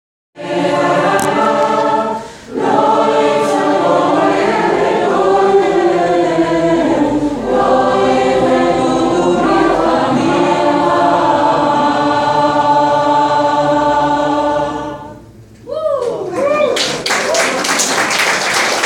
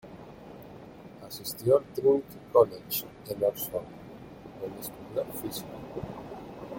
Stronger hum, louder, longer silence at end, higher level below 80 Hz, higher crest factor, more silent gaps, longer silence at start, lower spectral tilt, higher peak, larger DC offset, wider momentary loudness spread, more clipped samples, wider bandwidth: neither; first, -13 LUFS vs -30 LUFS; about the same, 0 s vs 0 s; first, -44 dBFS vs -60 dBFS; second, 12 dB vs 24 dB; neither; first, 0.35 s vs 0.05 s; second, -4 dB/octave vs -5.5 dB/octave; first, 0 dBFS vs -8 dBFS; neither; second, 6 LU vs 23 LU; neither; about the same, 17 kHz vs 17 kHz